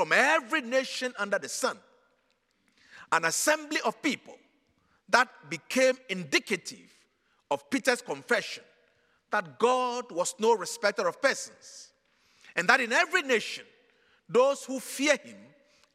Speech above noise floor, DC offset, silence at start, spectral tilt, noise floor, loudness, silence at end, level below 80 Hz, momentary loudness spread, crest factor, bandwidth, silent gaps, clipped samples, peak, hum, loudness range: 44 dB; under 0.1%; 0 s; -2 dB/octave; -73 dBFS; -28 LUFS; 0.5 s; -84 dBFS; 12 LU; 24 dB; 16 kHz; none; under 0.1%; -6 dBFS; none; 4 LU